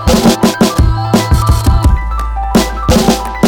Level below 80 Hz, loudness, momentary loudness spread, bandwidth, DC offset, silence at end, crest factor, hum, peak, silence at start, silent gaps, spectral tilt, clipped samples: -16 dBFS; -11 LUFS; 3 LU; 18.5 kHz; under 0.1%; 0 s; 10 dB; none; 0 dBFS; 0 s; none; -5.5 dB/octave; under 0.1%